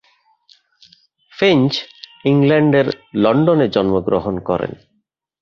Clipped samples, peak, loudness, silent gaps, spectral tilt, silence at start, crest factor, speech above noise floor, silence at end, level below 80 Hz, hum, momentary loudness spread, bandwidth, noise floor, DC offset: under 0.1%; -2 dBFS; -16 LUFS; none; -7.5 dB/octave; 1.4 s; 16 dB; 53 dB; 0.65 s; -48 dBFS; none; 9 LU; 6.8 kHz; -68 dBFS; under 0.1%